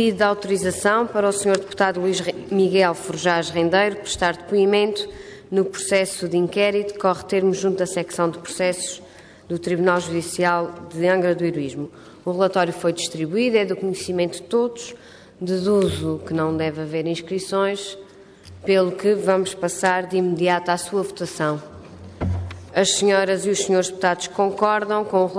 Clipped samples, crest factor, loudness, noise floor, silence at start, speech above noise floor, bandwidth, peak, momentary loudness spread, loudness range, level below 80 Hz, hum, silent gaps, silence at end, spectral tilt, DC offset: under 0.1%; 16 dB; -21 LUFS; -44 dBFS; 0 s; 23 dB; 11 kHz; -4 dBFS; 10 LU; 3 LU; -54 dBFS; none; none; 0 s; -4.5 dB/octave; under 0.1%